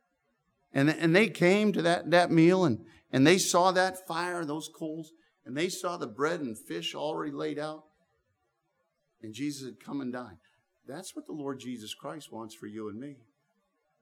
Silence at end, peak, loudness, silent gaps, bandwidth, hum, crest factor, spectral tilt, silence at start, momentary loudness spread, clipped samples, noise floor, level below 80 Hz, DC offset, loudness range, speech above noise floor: 0.85 s; -8 dBFS; -28 LUFS; none; 18 kHz; none; 24 dB; -5 dB/octave; 0.75 s; 19 LU; under 0.1%; -78 dBFS; -78 dBFS; under 0.1%; 17 LU; 49 dB